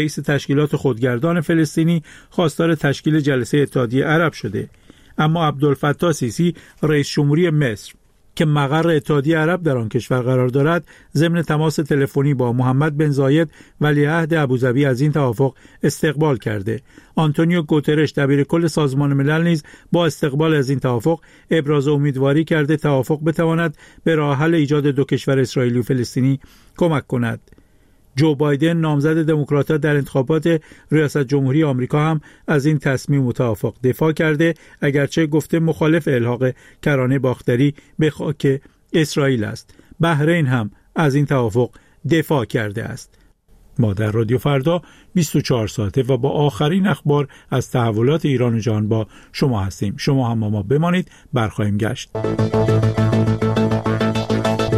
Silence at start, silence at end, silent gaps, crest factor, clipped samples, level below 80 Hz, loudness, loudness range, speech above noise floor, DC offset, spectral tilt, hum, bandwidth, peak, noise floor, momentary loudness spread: 0 s; 0 s; none; 12 dB; under 0.1%; -48 dBFS; -18 LUFS; 2 LU; 35 dB; under 0.1%; -7 dB/octave; none; 15.5 kHz; -6 dBFS; -52 dBFS; 6 LU